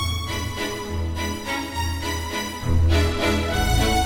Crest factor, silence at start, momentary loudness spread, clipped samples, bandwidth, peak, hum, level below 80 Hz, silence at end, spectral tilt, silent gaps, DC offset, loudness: 14 dB; 0 s; 7 LU; under 0.1%; 18 kHz; -8 dBFS; none; -28 dBFS; 0 s; -4.5 dB/octave; none; under 0.1%; -24 LUFS